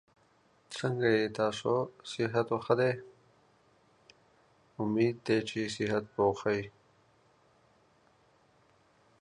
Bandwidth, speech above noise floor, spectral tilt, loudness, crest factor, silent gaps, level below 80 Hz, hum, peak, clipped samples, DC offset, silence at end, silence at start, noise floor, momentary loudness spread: 11 kHz; 37 dB; -6 dB/octave; -31 LUFS; 22 dB; none; -68 dBFS; none; -12 dBFS; under 0.1%; under 0.1%; 2.5 s; 0.7 s; -67 dBFS; 10 LU